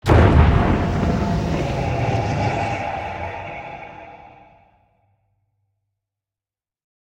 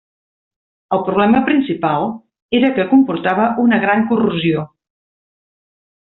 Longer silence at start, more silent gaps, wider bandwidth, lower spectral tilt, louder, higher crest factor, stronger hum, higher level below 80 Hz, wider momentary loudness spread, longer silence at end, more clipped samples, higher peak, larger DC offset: second, 0.05 s vs 0.9 s; second, none vs 2.42-2.49 s; first, 9.6 kHz vs 4.1 kHz; first, -7.5 dB/octave vs -4.5 dB/octave; second, -20 LUFS vs -15 LUFS; first, 20 dB vs 14 dB; neither; first, -28 dBFS vs -54 dBFS; first, 21 LU vs 8 LU; first, 2.9 s vs 1.35 s; neither; about the same, 0 dBFS vs -2 dBFS; neither